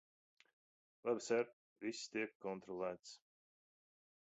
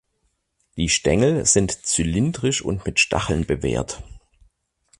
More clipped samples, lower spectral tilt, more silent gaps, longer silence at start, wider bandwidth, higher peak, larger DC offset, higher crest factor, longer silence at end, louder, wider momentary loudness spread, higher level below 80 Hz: neither; about the same, -3.5 dB/octave vs -3.5 dB/octave; first, 1.53-1.76 s, 2.35-2.40 s vs none; first, 1.05 s vs 0.75 s; second, 8 kHz vs 11.5 kHz; second, -24 dBFS vs -4 dBFS; neither; about the same, 22 dB vs 18 dB; first, 1.2 s vs 0.85 s; second, -44 LUFS vs -20 LUFS; first, 13 LU vs 9 LU; second, -88 dBFS vs -38 dBFS